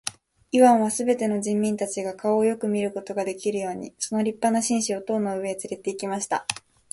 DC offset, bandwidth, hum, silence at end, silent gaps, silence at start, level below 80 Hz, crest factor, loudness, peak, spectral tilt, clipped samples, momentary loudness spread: under 0.1%; 11.5 kHz; none; 0.4 s; none; 0.05 s; -66 dBFS; 24 dB; -24 LUFS; -2 dBFS; -4.5 dB/octave; under 0.1%; 11 LU